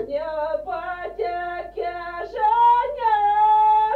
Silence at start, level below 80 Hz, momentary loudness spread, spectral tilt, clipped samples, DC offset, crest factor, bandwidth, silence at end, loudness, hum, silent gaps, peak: 0 s; -50 dBFS; 13 LU; -5 dB/octave; under 0.1%; under 0.1%; 12 dB; 4.7 kHz; 0 s; -21 LUFS; 50 Hz at -50 dBFS; none; -10 dBFS